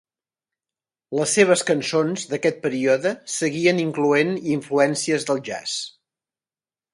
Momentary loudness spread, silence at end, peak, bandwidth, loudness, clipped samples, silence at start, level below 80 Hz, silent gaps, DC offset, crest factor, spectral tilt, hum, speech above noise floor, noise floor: 9 LU; 1.05 s; -2 dBFS; 11.5 kHz; -21 LUFS; under 0.1%; 1.1 s; -68 dBFS; none; under 0.1%; 20 dB; -4 dB/octave; none; over 69 dB; under -90 dBFS